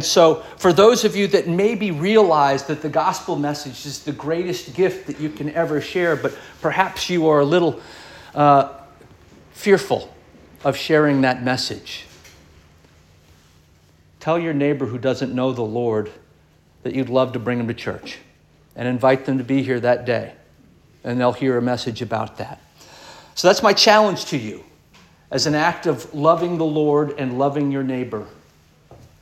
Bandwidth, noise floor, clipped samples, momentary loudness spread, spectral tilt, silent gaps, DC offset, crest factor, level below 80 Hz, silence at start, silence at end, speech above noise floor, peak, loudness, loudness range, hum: 16 kHz; -54 dBFS; under 0.1%; 15 LU; -5 dB/octave; none; under 0.1%; 20 dB; -56 dBFS; 0 s; 0.25 s; 35 dB; -2 dBFS; -19 LUFS; 6 LU; none